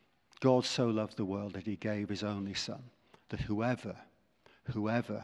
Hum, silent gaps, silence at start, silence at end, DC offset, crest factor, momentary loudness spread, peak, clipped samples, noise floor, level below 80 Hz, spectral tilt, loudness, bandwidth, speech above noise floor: none; none; 0.4 s; 0 s; under 0.1%; 22 dB; 15 LU; -14 dBFS; under 0.1%; -67 dBFS; -60 dBFS; -5.5 dB/octave; -35 LUFS; 11.5 kHz; 32 dB